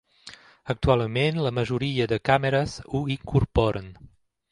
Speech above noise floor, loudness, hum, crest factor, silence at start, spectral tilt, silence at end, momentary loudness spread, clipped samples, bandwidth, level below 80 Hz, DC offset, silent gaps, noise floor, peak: 24 dB; -25 LUFS; none; 20 dB; 0.25 s; -7 dB/octave; 0.45 s; 22 LU; under 0.1%; 11 kHz; -40 dBFS; under 0.1%; none; -49 dBFS; -4 dBFS